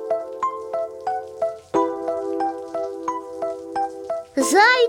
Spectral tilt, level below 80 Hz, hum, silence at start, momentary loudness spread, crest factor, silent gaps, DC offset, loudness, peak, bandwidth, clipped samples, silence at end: -2 dB/octave; -64 dBFS; none; 0 s; 9 LU; 20 dB; none; under 0.1%; -24 LUFS; -2 dBFS; 18 kHz; under 0.1%; 0 s